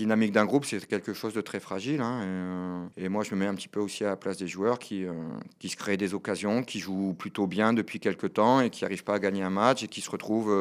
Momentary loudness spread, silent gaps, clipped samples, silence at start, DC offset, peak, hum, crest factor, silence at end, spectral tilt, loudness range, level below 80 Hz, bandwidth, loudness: 10 LU; none; under 0.1%; 0 s; under 0.1%; -8 dBFS; none; 22 dB; 0 s; -5.5 dB/octave; 5 LU; -76 dBFS; 15.5 kHz; -29 LUFS